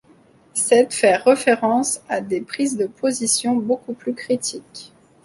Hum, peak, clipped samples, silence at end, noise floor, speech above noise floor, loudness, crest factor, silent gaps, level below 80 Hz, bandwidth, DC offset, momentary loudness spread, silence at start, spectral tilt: none; -2 dBFS; under 0.1%; 0.4 s; -53 dBFS; 33 dB; -19 LUFS; 18 dB; none; -64 dBFS; 12 kHz; under 0.1%; 12 LU; 0.55 s; -3 dB/octave